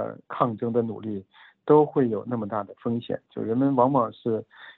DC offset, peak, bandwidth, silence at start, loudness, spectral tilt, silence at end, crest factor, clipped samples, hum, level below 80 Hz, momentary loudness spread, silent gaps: under 0.1%; -6 dBFS; 4.1 kHz; 0 s; -25 LUFS; -11 dB/octave; 0.05 s; 20 dB; under 0.1%; none; -70 dBFS; 14 LU; none